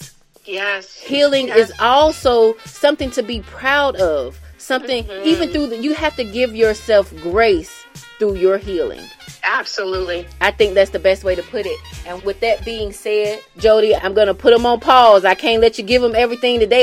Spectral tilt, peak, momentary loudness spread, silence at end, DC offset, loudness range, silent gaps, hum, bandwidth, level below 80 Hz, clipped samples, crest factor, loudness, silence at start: -4 dB/octave; 0 dBFS; 12 LU; 0 s; under 0.1%; 6 LU; none; none; 15 kHz; -38 dBFS; under 0.1%; 16 dB; -16 LUFS; 0 s